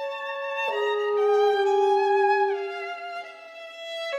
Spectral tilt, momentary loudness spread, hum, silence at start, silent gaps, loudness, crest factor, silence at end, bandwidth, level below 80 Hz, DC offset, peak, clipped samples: -1.5 dB/octave; 16 LU; none; 0 s; none; -24 LUFS; 14 dB; 0 s; 8.4 kHz; -86 dBFS; under 0.1%; -10 dBFS; under 0.1%